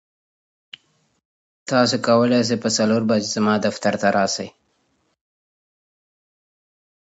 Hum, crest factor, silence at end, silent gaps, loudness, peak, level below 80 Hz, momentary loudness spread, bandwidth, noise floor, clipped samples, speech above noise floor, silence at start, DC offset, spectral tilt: none; 20 dB; 2.55 s; none; -19 LUFS; -2 dBFS; -64 dBFS; 6 LU; 8 kHz; -67 dBFS; under 0.1%; 49 dB; 1.65 s; under 0.1%; -4.5 dB/octave